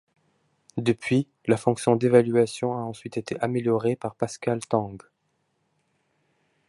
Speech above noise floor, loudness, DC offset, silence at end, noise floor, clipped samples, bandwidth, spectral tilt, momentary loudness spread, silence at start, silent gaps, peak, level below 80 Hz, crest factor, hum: 49 dB; -25 LUFS; under 0.1%; 1.7 s; -73 dBFS; under 0.1%; 11.5 kHz; -6.5 dB/octave; 13 LU; 0.75 s; none; -4 dBFS; -64 dBFS; 22 dB; none